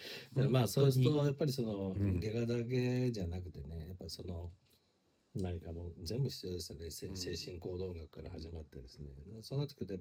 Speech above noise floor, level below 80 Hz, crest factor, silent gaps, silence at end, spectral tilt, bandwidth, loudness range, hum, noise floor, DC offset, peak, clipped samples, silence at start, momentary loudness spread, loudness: 38 dB; -60 dBFS; 20 dB; none; 0 s; -6.5 dB/octave; 16.5 kHz; 11 LU; none; -75 dBFS; under 0.1%; -18 dBFS; under 0.1%; 0 s; 17 LU; -38 LUFS